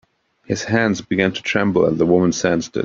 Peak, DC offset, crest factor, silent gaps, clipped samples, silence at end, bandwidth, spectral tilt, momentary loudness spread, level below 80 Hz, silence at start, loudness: -2 dBFS; under 0.1%; 18 dB; none; under 0.1%; 0 s; 7.6 kHz; -5.5 dB/octave; 4 LU; -52 dBFS; 0.5 s; -18 LUFS